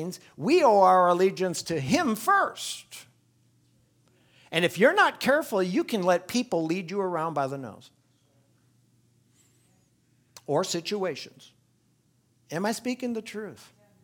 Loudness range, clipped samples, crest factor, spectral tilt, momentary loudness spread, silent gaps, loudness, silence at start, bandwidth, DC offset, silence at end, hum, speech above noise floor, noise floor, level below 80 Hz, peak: 11 LU; under 0.1%; 20 dB; -4.5 dB/octave; 18 LU; none; -25 LUFS; 0 s; 19.5 kHz; under 0.1%; 0.5 s; none; 42 dB; -67 dBFS; -72 dBFS; -6 dBFS